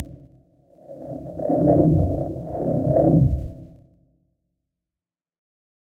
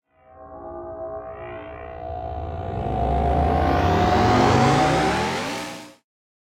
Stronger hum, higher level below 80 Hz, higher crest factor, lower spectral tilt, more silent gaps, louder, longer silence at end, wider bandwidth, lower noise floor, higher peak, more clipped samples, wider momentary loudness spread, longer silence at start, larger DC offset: neither; about the same, -36 dBFS vs -34 dBFS; about the same, 20 dB vs 16 dB; first, -12.5 dB/octave vs -6 dB/octave; neither; about the same, -20 LUFS vs -21 LUFS; first, 2.35 s vs 0.6 s; second, 2.1 kHz vs 16 kHz; first, under -90 dBFS vs -46 dBFS; about the same, -4 dBFS vs -6 dBFS; neither; about the same, 19 LU vs 19 LU; second, 0 s vs 0.35 s; neither